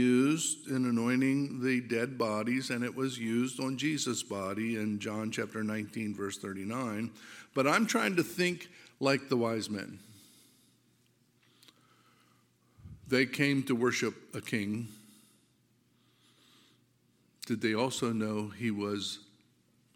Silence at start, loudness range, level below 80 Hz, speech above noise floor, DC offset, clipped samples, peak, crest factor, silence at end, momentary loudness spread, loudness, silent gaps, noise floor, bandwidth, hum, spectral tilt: 0 s; 8 LU; -74 dBFS; 38 dB; under 0.1%; under 0.1%; -12 dBFS; 22 dB; 0.75 s; 11 LU; -32 LUFS; none; -70 dBFS; 17 kHz; none; -4.5 dB/octave